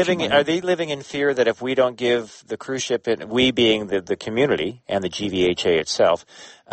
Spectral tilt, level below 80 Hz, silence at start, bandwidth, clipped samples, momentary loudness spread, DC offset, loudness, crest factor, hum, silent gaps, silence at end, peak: -4 dB/octave; -54 dBFS; 0 s; 8.8 kHz; under 0.1%; 7 LU; under 0.1%; -21 LUFS; 16 dB; none; none; 0 s; -4 dBFS